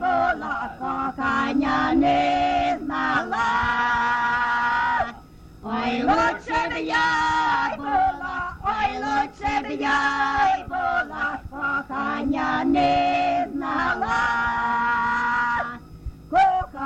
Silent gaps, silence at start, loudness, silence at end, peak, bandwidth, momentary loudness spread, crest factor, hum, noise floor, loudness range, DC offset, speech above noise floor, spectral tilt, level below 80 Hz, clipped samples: none; 0 s; -22 LUFS; 0 s; -8 dBFS; 8.8 kHz; 7 LU; 14 dB; none; -44 dBFS; 2 LU; under 0.1%; 24 dB; -5 dB/octave; -44 dBFS; under 0.1%